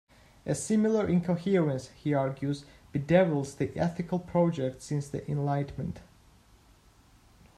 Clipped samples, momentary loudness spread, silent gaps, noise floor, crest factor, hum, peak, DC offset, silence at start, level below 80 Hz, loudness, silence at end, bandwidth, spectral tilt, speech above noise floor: under 0.1%; 11 LU; none; -60 dBFS; 20 dB; none; -8 dBFS; under 0.1%; 0.45 s; -58 dBFS; -29 LUFS; 1.55 s; 12.5 kHz; -7 dB/octave; 31 dB